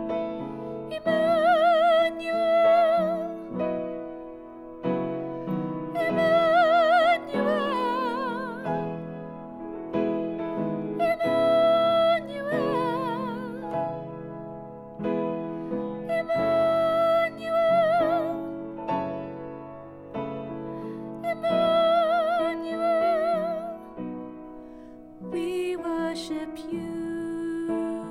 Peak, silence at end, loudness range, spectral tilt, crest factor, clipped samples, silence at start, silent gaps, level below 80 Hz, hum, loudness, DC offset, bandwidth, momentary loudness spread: -12 dBFS; 0 s; 9 LU; -6.5 dB/octave; 14 dB; under 0.1%; 0 s; none; -60 dBFS; none; -25 LUFS; under 0.1%; 12 kHz; 18 LU